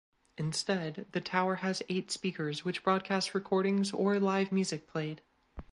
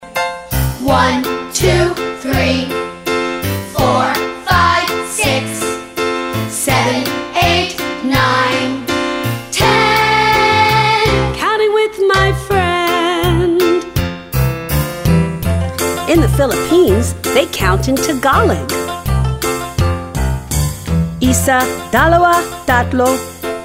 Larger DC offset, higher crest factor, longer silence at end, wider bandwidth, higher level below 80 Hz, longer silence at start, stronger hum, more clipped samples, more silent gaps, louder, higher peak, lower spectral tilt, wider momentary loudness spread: neither; about the same, 18 dB vs 14 dB; about the same, 0.1 s vs 0 s; second, 11.5 kHz vs 16.5 kHz; second, -64 dBFS vs -28 dBFS; first, 0.4 s vs 0 s; neither; neither; neither; second, -33 LUFS vs -14 LUFS; second, -14 dBFS vs 0 dBFS; about the same, -5 dB/octave vs -4.5 dB/octave; about the same, 8 LU vs 8 LU